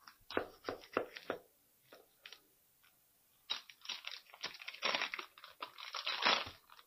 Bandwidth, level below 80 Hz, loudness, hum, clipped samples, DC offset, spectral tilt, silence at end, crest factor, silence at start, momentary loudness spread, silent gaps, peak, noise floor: 15.5 kHz; -78 dBFS; -40 LUFS; none; under 0.1%; under 0.1%; -1.5 dB/octave; 0.05 s; 30 dB; 0.05 s; 20 LU; none; -14 dBFS; -72 dBFS